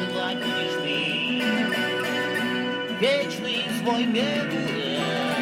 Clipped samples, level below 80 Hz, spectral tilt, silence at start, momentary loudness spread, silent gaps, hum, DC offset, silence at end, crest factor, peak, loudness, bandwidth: under 0.1%; -68 dBFS; -4.5 dB/octave; 0 s; 3 LU; none; none; under 0.1%; 0 s; 16 dB; -10 dBFS; -24 LUFS; 16.5 kHz